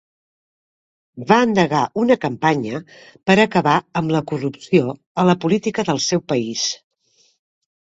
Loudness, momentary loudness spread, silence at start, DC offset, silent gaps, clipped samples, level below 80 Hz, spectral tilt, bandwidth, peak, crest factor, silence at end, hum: -18 LUFS; 10 LU; 1.15 s; under 0.1%; 5.06-5.15 s; under 0.1%; -58 dBFS; -5 dB/octave; 8 kHz; 0 dBFS; 20 dB; 1.2 s; none